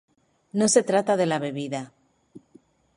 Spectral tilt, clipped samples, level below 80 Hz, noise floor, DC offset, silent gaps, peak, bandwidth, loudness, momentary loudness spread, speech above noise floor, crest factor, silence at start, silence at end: -4 dB/octave; under 0.1%; -70 dBFS; -58 dBFS; under 0.1%; none; -4 dBFS; 11.5 kHz; -24 LUFS; 13 LU; 35 dB; 22 dB; 0.55 s; 0.6 s